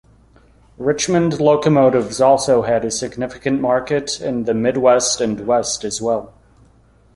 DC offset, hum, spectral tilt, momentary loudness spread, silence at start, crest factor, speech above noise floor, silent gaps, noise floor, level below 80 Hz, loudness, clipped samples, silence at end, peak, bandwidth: under 0.1%; none; -4.5 dB/octave; 9 LU; 0.8 s; 16 dB; 35 dB; none; -52 dBFS; -50 dBFS; -17 LUFS; under 0.1%; 0.85 s; -2 dBFS; 11.5 kHz